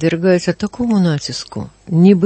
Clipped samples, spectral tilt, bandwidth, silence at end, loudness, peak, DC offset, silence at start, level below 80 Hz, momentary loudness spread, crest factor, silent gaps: under 0.1%; -7 dB/octave; 8.8 kHz; 0 s; -16 LUFS; 0 dBFS; under 0.1%; 0 s; -48 dBFS; 13 LU; 14 dB; none